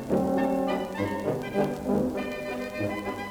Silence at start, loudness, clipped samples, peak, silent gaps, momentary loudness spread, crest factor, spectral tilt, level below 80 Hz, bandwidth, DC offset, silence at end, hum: 0 s; -29 LUFS; under 0.1%; -12 dBFS; none; 7 LU; 16 dB; -6.5 dB/octave; -54 dBFS; over 20 kHz; under 0.1%; 0 s; none